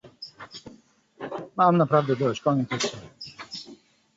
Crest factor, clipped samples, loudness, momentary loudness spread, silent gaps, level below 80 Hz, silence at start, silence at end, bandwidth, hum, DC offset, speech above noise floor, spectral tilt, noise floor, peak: 20 dB; under 0.1%; -24 LUFS; 21 LU; none; -66 dBFS; 0.05 s; 0.4 s; 8 kHz; none; under 0.1%; 32 dB; -5.5 dB/octave; -55 dBFS; -8 dBFS